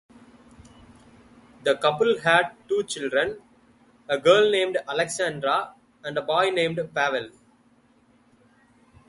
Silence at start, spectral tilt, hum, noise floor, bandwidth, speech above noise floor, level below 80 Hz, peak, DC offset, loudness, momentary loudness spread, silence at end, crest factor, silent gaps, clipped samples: 1.65 s; -3.5 dB/octave; none; -60 dBFS; 11.5 kHz; 37 dB; -64 dBFS; -4 dBFS; under 0.1%; -23 LUFS; 12 LU; 1.8 s; 22 dB; none; under 0.1%